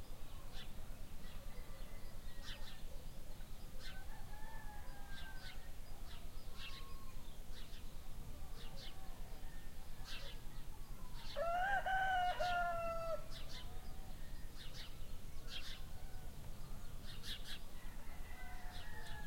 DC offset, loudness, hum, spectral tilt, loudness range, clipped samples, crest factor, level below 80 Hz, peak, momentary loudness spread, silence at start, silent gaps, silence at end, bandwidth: under 0.1%; -48 LUFS; none; -3.5 dB/octave; 13 LU; under 0.1%; 16 dB; -50 dBFS; -26 dBFS; 17 LU; 0 s; none; 0 s; 16.5 kHz